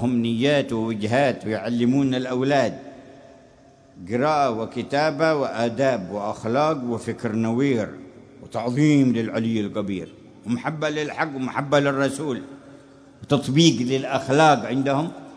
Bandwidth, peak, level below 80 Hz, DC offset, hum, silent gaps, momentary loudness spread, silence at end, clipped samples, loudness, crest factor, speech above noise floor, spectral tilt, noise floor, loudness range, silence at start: 11 kHz; -2 dBFS; -60 dBFS; under 0.1%; none; none; 12 LU; 0 s; under 0.1%; -22 LUFS; 20 dB; 30 dB; -6 dB/octave; -51 dBFS; 3 LU; 0 s